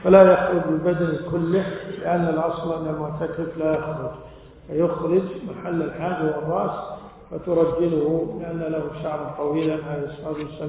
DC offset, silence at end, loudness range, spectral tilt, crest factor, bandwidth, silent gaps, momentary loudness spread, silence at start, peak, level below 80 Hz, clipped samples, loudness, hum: under 0.1%; 0 s; 2 LU; -11.5 dB/octave; 20 dB; 4 kHz; none; 10 LU; 0 s; -2 dBFS; -50 dBFS; under 0.1%; -23 LUFS; none